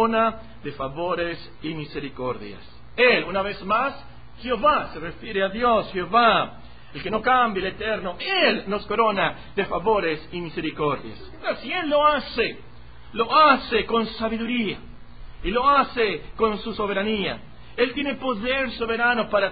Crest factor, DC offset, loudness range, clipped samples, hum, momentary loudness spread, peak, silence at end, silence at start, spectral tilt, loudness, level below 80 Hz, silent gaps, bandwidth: 20 dB; 0.8%; 3 LU; under 0.1%; none; 15 LU; -4 dBFS; 0 s; 0 s; -9.5 dB/octave; -23 LUFS; -46 dBFS; none; 5 kHz